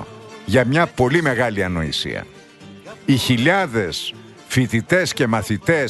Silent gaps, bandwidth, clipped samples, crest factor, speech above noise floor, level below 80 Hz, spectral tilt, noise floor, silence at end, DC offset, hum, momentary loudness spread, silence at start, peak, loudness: none; 12.5 kHz; under 0.1%; 16 dB; 23 dB; -46 dBFS; -5 dB/octave; -41 dBFS; 0 s; under 0.1%; none; 13 LU; 0 s; -2 dBFS; -19 LUFS